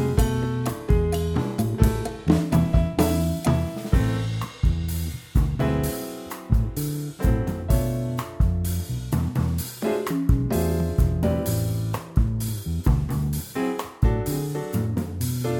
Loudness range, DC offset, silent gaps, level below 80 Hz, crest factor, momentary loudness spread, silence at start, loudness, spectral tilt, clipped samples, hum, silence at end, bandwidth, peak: 3 LU; under 0.1%; none; -28 dBFS; 20 dB; 6 LU; 0 s; -25 LUFS; -7 dB/octave; under 0.1%; none; 0 s; 17.5 kHz; -4 dBFS